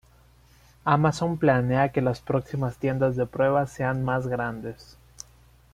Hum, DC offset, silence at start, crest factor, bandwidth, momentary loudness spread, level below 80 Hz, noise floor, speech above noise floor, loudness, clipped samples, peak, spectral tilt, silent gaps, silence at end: none; under 0.1%; 0.85 s; 20 dB; 13 kHz; 19 LU; -52 dBFS; -56 dBFS; 32 dB; -25 LUFS; under 0.1%; -6 dBFS; -7.5 dB/octave; none; 0.9 s